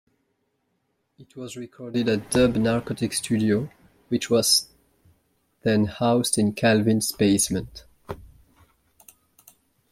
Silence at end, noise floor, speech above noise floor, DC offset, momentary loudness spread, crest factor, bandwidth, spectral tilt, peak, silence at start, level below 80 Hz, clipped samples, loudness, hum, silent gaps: 1.7 s; -73 dBFS; 51 dB; under 0.1%; 20 LU; 18 dB; 16 kHz; -4 dB/octave; -6 dBFS; 1.2 s; -52 dBFS; under 0.1%; -22 LUFS; none; none